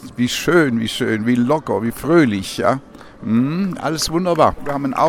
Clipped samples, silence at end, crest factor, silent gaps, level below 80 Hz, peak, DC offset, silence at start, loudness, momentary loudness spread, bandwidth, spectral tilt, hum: under 0.1%; 0 s; 18 dB; none; -44 dBFS; 0 dBFS; under 0.1%; 0 s; -18 LUFS; 7 LU; 17.5 kHz; -5.5 dB/octave; none